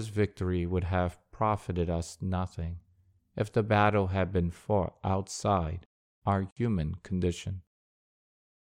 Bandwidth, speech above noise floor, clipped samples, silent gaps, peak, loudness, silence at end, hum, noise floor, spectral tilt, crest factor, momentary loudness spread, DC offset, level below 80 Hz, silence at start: 11.5 kHz; 37 dB; under 0.1%; 5.86-6.22 s, 6.52-6.56 s; -12 dBFS; -31 LUFS; 1.2 s; none; -66 dBFS; -7 dB/octave; 20 dB; 11 LU; under 0.1%; -48 dBFS; 0 s